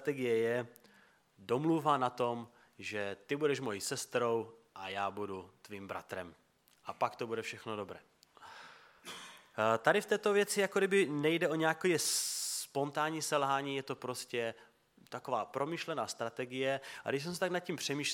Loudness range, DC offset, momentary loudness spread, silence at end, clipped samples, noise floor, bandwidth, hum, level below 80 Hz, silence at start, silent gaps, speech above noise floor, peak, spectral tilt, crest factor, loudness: 10 LU; under 0.1%; 18 LU; 0 s; under 0.1%; -66 dBFS; 17 kHz; none; -82 dBFS; 0 s; none; 31 dB; -12 dBFS; -3.5 dB/octave; 24 dB; -35 LUFS